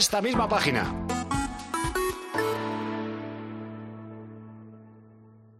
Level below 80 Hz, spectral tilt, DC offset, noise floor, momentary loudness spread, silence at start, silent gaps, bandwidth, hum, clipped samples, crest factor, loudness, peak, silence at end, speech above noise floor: -46 dBFS; -3.5 dB/octave; under 0.1%; -53 dBFS; 20 LU; 0 s; none; 14 kHz; none; under 0.1%; 22 dB; -29 LUFS; -8 dBFS; 0.05 s; 28 dB